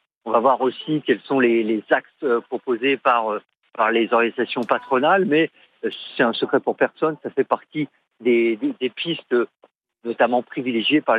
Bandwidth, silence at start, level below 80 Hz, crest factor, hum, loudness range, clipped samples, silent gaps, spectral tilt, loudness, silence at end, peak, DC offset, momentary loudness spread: 5 kHz; 0.25 s; -80 dBFS; 16 dB; none; 3 LU; under 0.1%; 9.75-9.79 s; -7.5 dB/octave; -21 LUFS; 0 s; -4 dBFS; under 0.1%; 11 LU